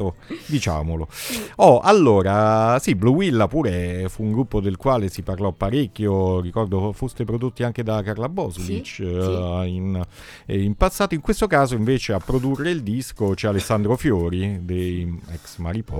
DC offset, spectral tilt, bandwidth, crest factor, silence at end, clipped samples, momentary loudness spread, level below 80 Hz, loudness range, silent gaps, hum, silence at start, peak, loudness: under 0.1%; -6.5 dB/octave; 18.5 kHz; 20 dB; 0 s; under 0.1%; 11 LU; -36 dBFS; 8 LU; none; none; 0 s; -2 dBFS; -21 LUFS